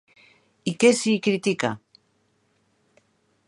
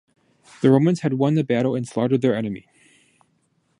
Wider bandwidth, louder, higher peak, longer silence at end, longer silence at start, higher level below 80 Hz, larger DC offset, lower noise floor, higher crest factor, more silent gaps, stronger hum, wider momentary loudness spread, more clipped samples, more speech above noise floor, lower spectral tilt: about the same, 11.5 kHz vs 11 kHz; about the same, -22 LUFS vs -21 LUFS; about the same, -4 dBFS vs -4 dBFS; first, 1.7 s vs 1.25 s; about the same, 0.65 s vs 0.6 s; second, -70 dBFS vs -64 dBFS; neither; about the same, -68 dBFS vs -67 dBFS; about the same, 22 dB vs 20 dB; neither; neither; first, 13 LU vs 9 LU; neither; about the same, 46 dB vs 47 dB; second, -4.5 dB/octave vs -8 dB/octave